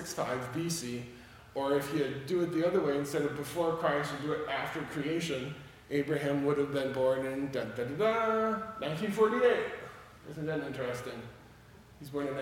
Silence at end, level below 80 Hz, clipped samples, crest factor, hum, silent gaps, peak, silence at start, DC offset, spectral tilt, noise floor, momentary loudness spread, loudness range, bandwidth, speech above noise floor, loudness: 0 s; -64 dBFS; under 0.1%; 18 dB; none; none; -14 dBFS; 0 s; under 0.1%; -5.5 dB/octave; -55 dBFS; 14 LU; 3 LU; 17.5 kHz; 23 dB; -33 LUFS